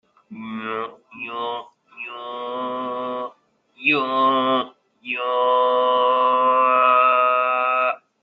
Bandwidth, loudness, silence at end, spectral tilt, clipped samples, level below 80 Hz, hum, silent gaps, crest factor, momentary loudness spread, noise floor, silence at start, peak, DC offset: 5 kHz; -19 LUFS; 0.25 s; -6.5 dB/octave; under 0.1%; -72 dBFS; none; none; 16 dB; 18 LU; -56 dBFS; 0.3 s; -4 dBFS; under 0.1%